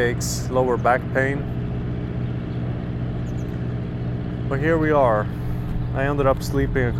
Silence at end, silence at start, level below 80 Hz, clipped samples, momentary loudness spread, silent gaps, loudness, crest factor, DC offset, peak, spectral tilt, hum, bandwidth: 0 s; 0 s; -32 dBFS; under 0.1%; 9 LU; none; -23 LUFS; 16 dB; under 0.1%; -4 dBFS; -6.5 dB/octave; none; 13.5 kHz